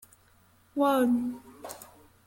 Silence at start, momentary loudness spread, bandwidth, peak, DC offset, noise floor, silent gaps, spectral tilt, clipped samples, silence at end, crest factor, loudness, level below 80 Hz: 0.75 s; 20 LU; 17 kHz; -14 dBFS; under 0.1%; -62 dBFS; none; -5 dB/octave; under 0.1%; 0.4 s; 16 dB; -27 LUFS; -68 dBFS